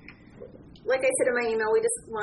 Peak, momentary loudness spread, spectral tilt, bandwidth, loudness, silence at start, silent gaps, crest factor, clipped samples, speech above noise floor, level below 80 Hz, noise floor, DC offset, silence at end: -12 dBFS; 11 LU; -2.5 dB/octave; 11.5 kHz; -25 LUFS; 0.05 s; none; 14 dB; under 0.1%; 22 dB; -60 dBFS; -47 dBFS; under 0.1%; 0 s